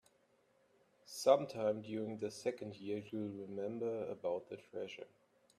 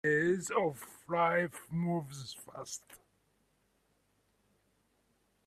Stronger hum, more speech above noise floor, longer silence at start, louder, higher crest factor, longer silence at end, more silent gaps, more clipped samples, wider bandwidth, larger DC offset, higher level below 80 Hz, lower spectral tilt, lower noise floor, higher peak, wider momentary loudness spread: neither; second, 35 dB vs 40 dB; first, 1.05 s vs 0.05 s; second, -40 LUFS vs -34 LUFS; about the same, 24 dB vs 20 dB; second, 0.5 s vs 2.5 s; neither; neither; about the same, 14 kHz vs 14.5 kHz; neither; second, -84 dBFS vs -72 dBFS; about the same, -5.5 dB/octave vs -5 dB/octave; about the same, -74 dBFS vs -75 dBFS; about the same, -16 dBFS vs -16 dBFS; about the same, 16 LU vs 16 LU